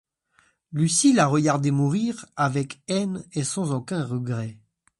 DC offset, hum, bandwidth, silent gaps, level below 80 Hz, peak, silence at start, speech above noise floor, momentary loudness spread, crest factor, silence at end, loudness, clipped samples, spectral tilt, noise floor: under 0.1%; none; 11.5 kHz; none; -64 dBFS; -6 dBFS; 0.7 s; 41 dB; 11 LU; 18 dB; 0.45 s; -24 LUFS; under 0.1%; -5 dB/octave; -64 dBFS